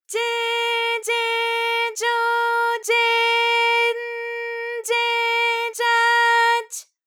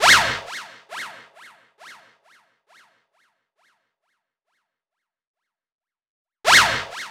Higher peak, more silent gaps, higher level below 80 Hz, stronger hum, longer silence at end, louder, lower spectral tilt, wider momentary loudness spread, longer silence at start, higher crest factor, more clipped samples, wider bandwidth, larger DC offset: second, -8 dBFS vs 0 dBFS; second, none vs 5.27-5.34 s, 5.74-5.79 s, 6.07-6.25 s; second, under -90 dBFS vs -56 dBFS; neither; first, 0.25 s vs 0 s; second, -19 LUFS vs -16 LUFS; second, 5 dB/octave vs 0 dB/octave; second, 11 LU vs 22 LU; about the same, 0.1 s vs 0 s; second, 14 dB vs 24 dB; neither; about the same, 19.5 kHz vs 18.5 kHz; neither